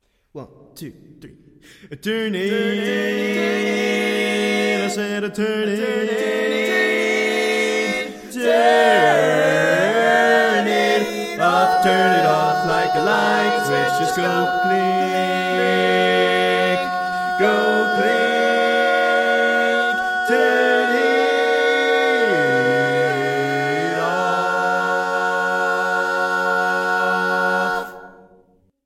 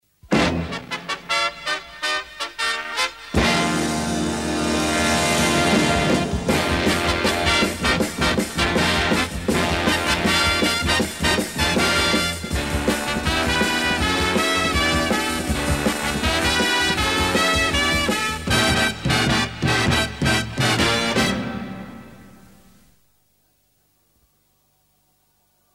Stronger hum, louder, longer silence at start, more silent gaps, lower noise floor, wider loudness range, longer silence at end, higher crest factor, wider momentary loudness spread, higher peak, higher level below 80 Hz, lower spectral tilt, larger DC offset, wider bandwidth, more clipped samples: second, none vs 50 Hz at -55 dBFS; about the same, -18 LUFS vs -20 LUFS; about the same, 0.35 s vs 0.25 s; neither; second, -56 dBFS vs -64 dBFS; about the same, 4 LU vs 4 LU; second, 0.75 s vs 3.45 s; about the same, 16 dB vs 16 dB; about the same, 6 LU vs 6 LU; about the same, -2 dBFS vs -4 dBFS; second, -60 dBFS vs -34 dBFS; about the same, -4 dB/octave vs -3.5 dB/octave; second, under 0.1% vs 0.2%; about the same, 16.5 kHz vs 16 kHz; neither